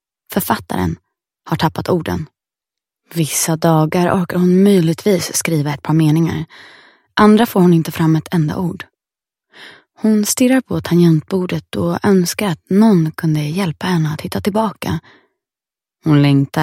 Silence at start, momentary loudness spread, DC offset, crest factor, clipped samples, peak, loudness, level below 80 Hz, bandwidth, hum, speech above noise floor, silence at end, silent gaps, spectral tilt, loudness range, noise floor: 0.3 s; 11 LU; under 0.1%; 16 dB; under 0.1%; 0 dBFS; -15 LUFS; -50 dBFS; 16.5 kHz; none; 75 dB; 0 s; none; -6 dB/octave; 4 LU; -89 dBFS